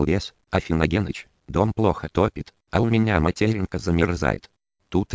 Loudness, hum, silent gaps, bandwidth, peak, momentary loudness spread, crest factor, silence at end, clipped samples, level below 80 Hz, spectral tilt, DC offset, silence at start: -23 LUFS; none; none; 8 kHz; -2 dBFS; 7 LU; 20 dB; 0 s; under 0.1%; -36 dBFS; -7 dB/octave; under 0.1%; 0 s